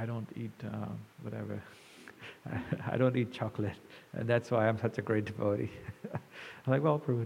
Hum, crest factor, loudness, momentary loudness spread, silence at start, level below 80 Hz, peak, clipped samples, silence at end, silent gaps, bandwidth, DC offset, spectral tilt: none; 20 dB; -34 LUFS; 18 LU; 0 s; -70 dBFS; -14 dBFS; under 0.1%; 0 s; none; 15 kHz; under 0.1%; -8 dB/octave